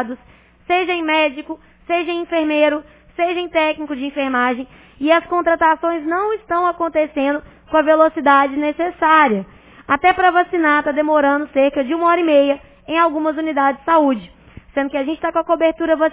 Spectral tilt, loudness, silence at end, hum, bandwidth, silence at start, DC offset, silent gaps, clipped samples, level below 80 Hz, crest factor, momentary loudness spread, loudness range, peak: -8 dB/octave; -17 LUFS; 0 s; none; 4 kHz; 0 s; under 0.1%; none; under 0.1%; -52 dBFS; 18 dB; 11 LU; 4 LU; 0 dBFS